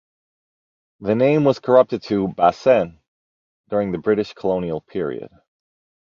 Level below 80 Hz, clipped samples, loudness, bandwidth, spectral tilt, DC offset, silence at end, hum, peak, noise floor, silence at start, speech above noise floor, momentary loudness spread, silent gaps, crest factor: -56 dBFS; under 0.1%; -19 LUFS; 7 kHz; -8 dB/octave; under 0.1%; 0.75 s; none; -2 dBFS; under -90 dBFS; 1 s; over 71 dB; 11 LU; 3.08-3.64 s; 18 dB